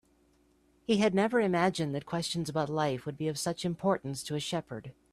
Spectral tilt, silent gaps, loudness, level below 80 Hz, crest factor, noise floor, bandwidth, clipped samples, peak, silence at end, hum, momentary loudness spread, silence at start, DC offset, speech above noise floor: -5 dB/octave; none; -31 LUFS; -66 dBFS; 16 dB; -67 dBFS; 14 kHz; under 0.1%; -14 dBFS; 0.2 s; none; 9 LU; 0.9 s; under 0.1%; 37 dB